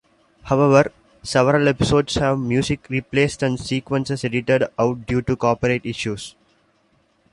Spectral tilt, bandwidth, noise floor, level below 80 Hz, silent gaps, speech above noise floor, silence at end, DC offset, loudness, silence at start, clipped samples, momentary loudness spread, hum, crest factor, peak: -6 dB/octave; 11.5 kHz; -62 dBFS; -44 dBFS; none; 42 dB; 1.05 s; under 0.1%; -20 LUFS; 0.45 s; under 0.1%; 9 LU; none; 18 dB; -2 dBFS